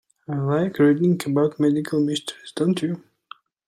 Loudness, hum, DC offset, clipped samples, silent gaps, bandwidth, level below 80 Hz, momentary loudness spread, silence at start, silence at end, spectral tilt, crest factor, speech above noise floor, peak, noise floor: -22 LUFS; none; under 0.1%; under 0.1%; none; 14.5 kHz; -66 dBFS; 11 LU; 0.3 s; 0.7 s; -6.5 dB/octave; 16 dB; 26 dB; -6 dBFS; -47 dBFS